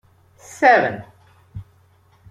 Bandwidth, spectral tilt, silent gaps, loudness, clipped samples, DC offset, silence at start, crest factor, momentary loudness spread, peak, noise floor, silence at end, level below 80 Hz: 13 kHz; -5 dB/octave; none; -16 LUFS; under 0.1%; under 0.1%; 0.6 s; 20 dB; 26 LU; -2 dBFS; -55 dBFS; 0.7 s; -56 dBFS